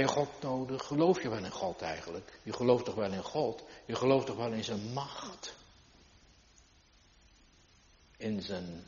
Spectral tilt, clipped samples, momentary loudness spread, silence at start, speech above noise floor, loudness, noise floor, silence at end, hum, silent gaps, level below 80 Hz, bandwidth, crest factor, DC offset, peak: -5 dB/octave; under 0.1%; 15 LU; 0 s; 30 dB; -34 LUFS; -64 dBFS; 0.05 s; none; none; -66 dBFS; 7.2 kHz; 22 dB; under 0.1%; -14 dBFS